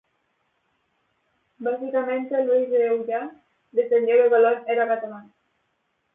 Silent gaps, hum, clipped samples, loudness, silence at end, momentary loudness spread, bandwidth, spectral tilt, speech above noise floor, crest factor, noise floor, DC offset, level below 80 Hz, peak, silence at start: none; none; under 0.1%; -22 LUFS; 0.95 s; 13 LU; 3.8 kHz; -8.5 dB/octave; 51 dB; 16 dB; -73 dBFS; under 0.1%; -80 dBFS; -8 dBFS; 1.6 s